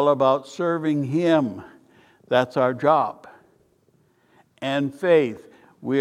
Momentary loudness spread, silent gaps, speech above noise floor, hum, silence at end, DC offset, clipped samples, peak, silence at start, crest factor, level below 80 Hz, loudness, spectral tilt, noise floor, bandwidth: 13 LU; none; 41 dB; none; 0 s; under 0.1%; under 0.1%; -4 dBFS; 0 s; 18 dB; -70 dBFS; -22 LUFS; -7 dB/octave; -62 dBFS; 12.5 kHz